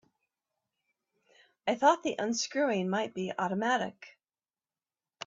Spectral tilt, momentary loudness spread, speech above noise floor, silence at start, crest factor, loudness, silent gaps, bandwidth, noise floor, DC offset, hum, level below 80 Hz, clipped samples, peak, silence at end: -4 dB/octave; 9 LU; over 60 dB; 1.65 s; 22 dB; -30 LUFS; none; 7.8 kHz; under -90 dBFS; under 0.1%; none; -78 dBFS; under 0.1%; -10 dBFS; 1.15 s